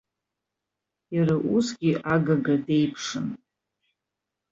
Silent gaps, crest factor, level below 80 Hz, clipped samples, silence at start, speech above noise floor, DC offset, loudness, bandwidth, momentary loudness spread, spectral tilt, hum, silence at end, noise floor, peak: none; 16 dB; -64 dBFS; under 0.1%; 1.1 s; 62 dB; under 0.1%; -25 LUFS; 7.8 kHz; 9 LU; -6.5 dB/octave; none; 1.15 s; -85 dBFS; -10 dBFS